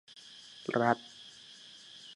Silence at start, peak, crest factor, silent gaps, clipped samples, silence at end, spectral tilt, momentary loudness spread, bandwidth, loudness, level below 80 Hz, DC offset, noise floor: 0.3 s; -12 dBFS; 26 dB; none; under 0.1%; 0 s; -5 dB/octave; 20 LU; 11.5 kHz; -32 LUFS; -82 dBFS; under 0.1%; -54 dBFS